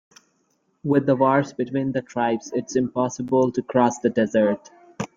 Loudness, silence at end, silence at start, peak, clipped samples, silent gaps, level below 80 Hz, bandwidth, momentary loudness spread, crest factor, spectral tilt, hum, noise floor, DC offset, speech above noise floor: -22 LUFS; 0.1 s; 0.85 s; -4 dBFS; under 0.1%; none; -62 dBFS; 7.6 kHz; 7 LU; 18 dB; -6.5 dB/octave; none; -68 dBFS; under 0.1%; 47 dB